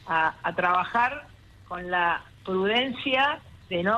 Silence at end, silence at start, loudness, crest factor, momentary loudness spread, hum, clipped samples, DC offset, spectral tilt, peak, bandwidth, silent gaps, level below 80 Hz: 0 s; 0.05 s; -25 LUFS; 16 dB; 12 LU; none; under 0.1%; under 0.1%; -5.5 dB/octave; -10 dBFS; 12.5 kHz; none; -56 dBFS